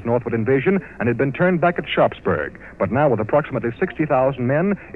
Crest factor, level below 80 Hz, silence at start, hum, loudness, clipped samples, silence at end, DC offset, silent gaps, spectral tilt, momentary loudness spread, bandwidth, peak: 14 dB; -48 dBFS; 0 s; none; -20 LUFS; under 0.1%; 0 s; 0.2%; none; -9.5 dB/octave; 6 LU; 4.4 kHz; -4 dBFS